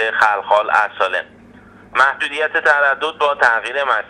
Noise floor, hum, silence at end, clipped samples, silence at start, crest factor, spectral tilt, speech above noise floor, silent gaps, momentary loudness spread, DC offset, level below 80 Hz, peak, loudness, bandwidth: -43 dBFS; none; 0.05 s; under 0.1%; 0 s; 16 dB; -2 dB/octave; 27 dB; none; 6 LU; under 0.1%; -58 dBFS; 0 dBFS; -16 LUFS; 10.5 kHz